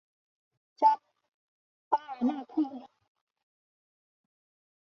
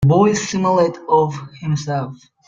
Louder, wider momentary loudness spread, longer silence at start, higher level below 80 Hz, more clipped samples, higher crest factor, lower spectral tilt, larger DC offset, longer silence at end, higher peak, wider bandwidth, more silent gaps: second, -30 LUFS vs -18 LUFS; about the same, 9 LU vs 10 LU; first, 0.8 s vs 0 s; second, -86 dBFS vs -48 dBFS; neither; first, 22 dB vs 16 dB; second, -3.5 dB/octave vs -6.5 dB/octave; neither; first, 2 s vs 0.3 s; second, -12 dBFS vs -2 dBFS; second, 6.4 kHz vs 7.8 kHz; first, 1.34-1.91 s vs none